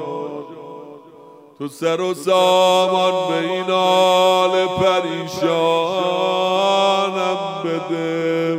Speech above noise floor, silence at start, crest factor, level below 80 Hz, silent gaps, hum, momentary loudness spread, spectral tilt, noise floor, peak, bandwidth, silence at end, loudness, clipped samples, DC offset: 27 dB; 0 s; 14 dB; -62 dBFS; none; none; 15 LU; -4.5 dB/octave; -43 dBFS; -4 dBFS; 15.5 kHz; 0 s; -17 LUFS; under 0.1%; under 0.1%